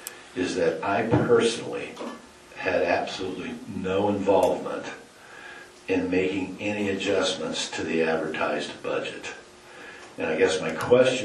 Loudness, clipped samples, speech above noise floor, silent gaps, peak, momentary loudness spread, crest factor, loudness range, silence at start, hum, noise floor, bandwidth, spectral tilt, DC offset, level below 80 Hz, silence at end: -26 LUFS; under 0.1%; 21 dB; none; -6 dBFS; 20 LU; 20 dB; 2 LU; 0 s; none; -46 dBFS; 12.5 kHz; -4.5 dB/octave; under 0.1%; -62 dBFS; 0 s